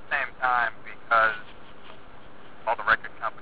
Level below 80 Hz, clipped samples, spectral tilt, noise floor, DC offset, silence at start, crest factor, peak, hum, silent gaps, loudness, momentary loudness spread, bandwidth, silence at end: -58 dBFS; under 0.1%; 0 dB/octave; -48 dBFS; 1%; 0.1 s; 20 dB; -8 dBFS; none; none; -25 LUFS; 13 LU; 4 kHz; 0 s